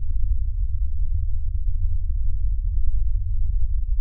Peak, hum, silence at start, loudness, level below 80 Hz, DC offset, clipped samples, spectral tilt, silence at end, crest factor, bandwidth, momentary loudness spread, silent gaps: -8 dBFS; none; 0 s; -28 LUFS; -22 dBFS; under 0.1%; under 0.1%; -25.5 dB/octave; 0 s; 12 dB; 0.2 kHz; 1 LU; none